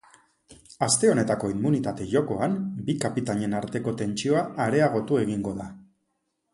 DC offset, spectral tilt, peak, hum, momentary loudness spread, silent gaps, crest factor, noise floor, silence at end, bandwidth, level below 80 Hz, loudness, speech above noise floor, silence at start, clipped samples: under 0.1%; -5 dB/octave; -8 dBFS; none; 8 LU; none; 18 dB; -76 dBFS; 0.7 s; 11.5 kHz; -58 dBFS; -25 LUFS; 52 dB; 0.5 s; under 0.1%